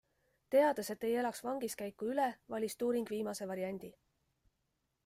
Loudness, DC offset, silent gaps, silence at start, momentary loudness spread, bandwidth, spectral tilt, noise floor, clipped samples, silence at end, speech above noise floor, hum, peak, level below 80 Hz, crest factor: -36 LUFS; under 0.1%; none; 0.5 s; 10 LU; 16 kHz; -4.5 dB/octave; -83 dBFS; under 0.1%; 1.15 s; 47 dB; none; -20 dBFS; -78 dBFS; 18 dB